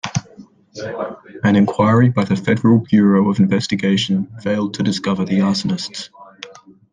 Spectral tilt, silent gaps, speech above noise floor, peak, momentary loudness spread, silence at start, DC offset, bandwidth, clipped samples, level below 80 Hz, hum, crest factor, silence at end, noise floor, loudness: -6.5 dB/octave; none; 28 dB; -2 dBFS; 17 LU; 0.05 s; under 0.1%; 9.6 kHz; under 0.1%; -54 dBFS; none; 14 dB; 0.4 s; -43 dBFS; -17 LUFS